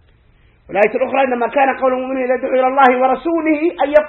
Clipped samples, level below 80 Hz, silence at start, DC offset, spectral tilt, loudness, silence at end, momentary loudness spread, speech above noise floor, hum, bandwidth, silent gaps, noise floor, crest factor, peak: under 0.1%; -52 dBFS; 0.7 s; under 0.1%; -7 dB/octave; -15 LUFS; 0 s; 6 LU; 37 dB; none; 4.4 kHz; none; -51 dBFS; 16 dB; 0 dBFS